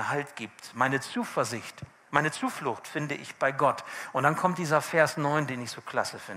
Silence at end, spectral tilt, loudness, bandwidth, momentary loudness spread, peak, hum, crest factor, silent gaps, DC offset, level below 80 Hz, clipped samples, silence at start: 0 s; -4.5 dB/octave; -29 LUFS; 16 kHz; 11 LU; -6 dBFS; none; 22 dB; none; under 0.1%; -72 dBFS; under 0.1%; 0 s